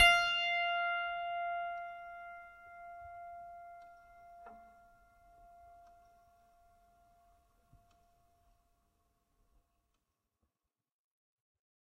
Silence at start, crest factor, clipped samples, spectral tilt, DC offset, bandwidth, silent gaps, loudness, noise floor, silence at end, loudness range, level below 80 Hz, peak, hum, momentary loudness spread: 0 s; 28 dB; under 0.1%; -0.5 dB/octave; under 0.1%; 13.5 kHz; none; -34 LUFS; under -90 dBFS; 7.2 s; 26 LU; -66 dBFS; -12 dBFS; none; 25 LU